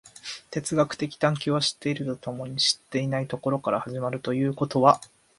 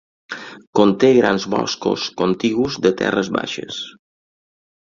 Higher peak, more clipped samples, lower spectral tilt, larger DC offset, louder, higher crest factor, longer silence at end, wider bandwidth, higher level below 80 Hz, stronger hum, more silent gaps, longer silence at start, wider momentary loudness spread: about the same, -4 dBFS vs -2 dBFS; neither; about the same, -4.5 dB/octave vs -5 dB/octave; neither; second, -26 LUFS vs -18 LUFS; about the same, 22 dB vs 18 dB; second, 0.35 s vs 0.95 s; first, 11.5 kHz vs 7.4 kHz; second, -64 dBFS vs -54 dBFS; neither; second, none vs 0.67-0.73 s; second, 0.05 s vs 0.3 s; second, 11 LU vs 18 LU